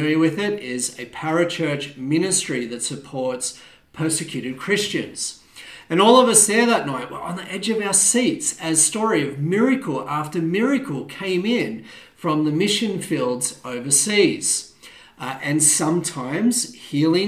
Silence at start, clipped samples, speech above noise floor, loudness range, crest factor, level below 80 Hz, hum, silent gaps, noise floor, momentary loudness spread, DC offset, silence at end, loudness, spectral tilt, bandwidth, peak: 0 s; under 0.1%; 26 dB; 6 LU; 20 dB; -64 dBFS; none; none; -46 dBFS; 13 LU; under 0.1%; 0 s; -20 LUFS; -3 dB/octave; 15.5 kHz; 0 dBFS